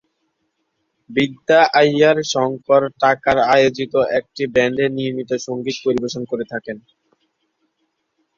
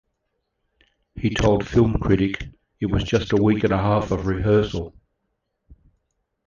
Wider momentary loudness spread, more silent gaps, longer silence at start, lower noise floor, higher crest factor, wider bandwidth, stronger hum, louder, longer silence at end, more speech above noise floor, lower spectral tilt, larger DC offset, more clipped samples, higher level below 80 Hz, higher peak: about the same, 11 LU vs 11 LU; neither; about the same, 1.1 s vs 1.15 s; second, -71 dBFS vs -75 dBFS; about the same, 18 dB vs 18 dB; about the same, 7.6 kHz vs 7.4 kHz; neither; first, -17 LUFS vs -21 LUFS; about the same, 1.6 s vs 1.6 s; about the same, 54 dB vs 55 dB; second, -4.5 dB/octave vs -7 dB/octave; neither; neither; second, -56 dBFS vs -36 dBFS; about the same, -2 dBFS vs -4 dBFS